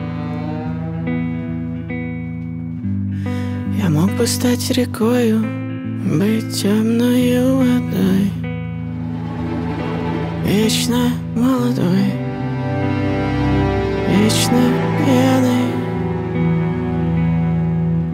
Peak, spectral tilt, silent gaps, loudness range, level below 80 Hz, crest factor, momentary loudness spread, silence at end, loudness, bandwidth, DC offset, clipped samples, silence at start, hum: -2 dBFS; -6 dB/octave; none; 4 LU; -38 dBFS; 16 dB; 10 LU; 0 s; -18 LUFS; 16 kHz; under 0.1%; under 0.1%; 0 s; none